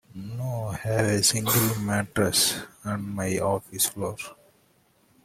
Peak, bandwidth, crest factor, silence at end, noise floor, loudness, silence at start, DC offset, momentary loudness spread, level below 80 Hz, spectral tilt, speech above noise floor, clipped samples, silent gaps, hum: -8 dBFS; 16.5 kHz; 18 dB; 0.9 s; -63 dBFS; -25 LUFS; 0.15 s; under 0.1%; 12 LU; -56 dBFS; -3.5 dB/octave; 38 dB; under 0.1%; none; none